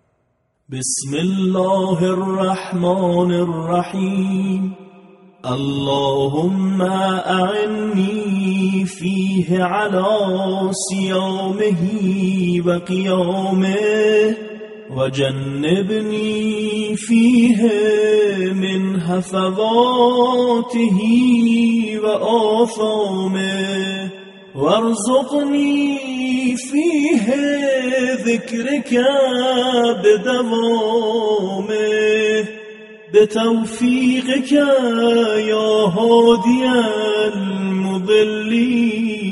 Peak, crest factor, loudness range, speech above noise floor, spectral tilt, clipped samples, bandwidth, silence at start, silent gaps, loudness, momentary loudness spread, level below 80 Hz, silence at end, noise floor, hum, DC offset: -2 dBFS; 16 dB; 4 LU; 49 dB; -5.5 dB/octave; under 0.1%; 11.5 kHz; 0.7 s; none; -17 LUFS; 7 LU; -58 dBFS; 0 s; -65 dBFS; none; under 0.1%